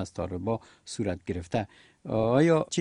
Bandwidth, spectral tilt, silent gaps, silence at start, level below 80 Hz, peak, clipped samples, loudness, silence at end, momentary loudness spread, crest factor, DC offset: 10.5 kHz; -6 dB/octave; none; 0 s; -54 dBFS; -10 dBFS; under 0.1%; -28 LUFS; 0 s; 15 LU; 18 dB; under 0.1%